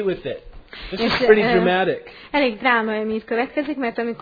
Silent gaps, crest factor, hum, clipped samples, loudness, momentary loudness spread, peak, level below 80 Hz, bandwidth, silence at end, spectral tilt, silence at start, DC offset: none; 20 dB; none; under 0.1%; -20 LUFS; 17 LU; 0 dBFS; -46 dBFS; 5 kHz; 0.05 s; -7 dB/octave; 0 s; under 0.1%